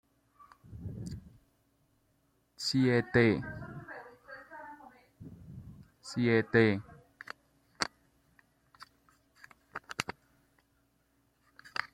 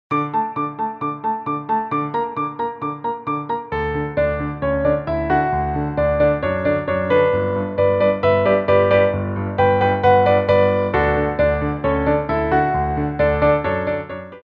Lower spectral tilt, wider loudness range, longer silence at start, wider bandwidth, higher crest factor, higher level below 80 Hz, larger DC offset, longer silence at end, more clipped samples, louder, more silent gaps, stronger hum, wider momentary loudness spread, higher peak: second, -6 dB/octave vs -9.5 dB/octave; first, 13 LU vs 7 LU; first, 0.7 s vs 0.1 s; first, 15 kHz vs 5.4 kHz; first, 26 dB vs 16 dB; second, -62 dBFS vs -36 dBFS; neither; about the same, 0.05 s vs 0.05 s; neither; second, -31 LUFS vs -19 LUFS; neither; neither; first, 24 LU vs 9 LU; second, -10 dBFS vs -2 dBFS